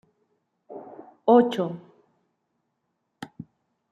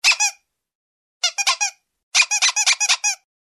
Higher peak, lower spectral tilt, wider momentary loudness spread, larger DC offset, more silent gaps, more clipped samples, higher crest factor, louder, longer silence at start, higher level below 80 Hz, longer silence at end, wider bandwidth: second, -6 dBFS vs -2 dBFS; first, -7.5 dB/octave vs 8 dB/octave; first, 26 LU vs 8 LU; neither; second, none vs 0.75-1.20 s, 2.03-2.12 s; neither; about the same, 22 dB vs 20 dB; second, -22 LUFS vs -17 LUFS; first, 0.7 s vs 0.05 s; second, -76 dBFS vs -68 dBFS; about the same, 0.5 s vs 0.4 s; second, 9.6 kHz vs 14 kHz